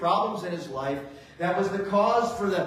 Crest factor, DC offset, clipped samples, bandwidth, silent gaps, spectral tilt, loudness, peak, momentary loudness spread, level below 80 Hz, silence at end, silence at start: 16 dB; under 0.1%; under 0.1%; 15 kHz; none; -6 dB/octave; -27 LUFS; -10 dBFS; 10 LU; -60 dBFS; 0 s; 0 s